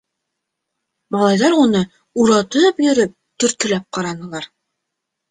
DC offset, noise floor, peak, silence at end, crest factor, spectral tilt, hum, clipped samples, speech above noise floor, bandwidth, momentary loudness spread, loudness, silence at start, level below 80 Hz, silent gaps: under 0.1%; -78 dBFS; -2 dBFS; 0.85 s; 16 dB; -4.5 dB/octave; none; under 0.1%; 63 dB; 9.8 kHz; 13 LU; -16 LUFS; 1.1 s; -58 dBFS; none